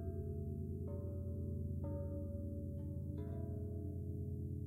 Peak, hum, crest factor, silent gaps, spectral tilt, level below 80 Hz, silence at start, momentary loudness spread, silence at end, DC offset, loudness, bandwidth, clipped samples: -32 dBFS; none; 10 dB; none; -11.5 dB/octave; -54 dBFS; 0 s; 2 LU; 0 s; under 0.1%; -45 LUFS; 1.7 kHz; under 0.1%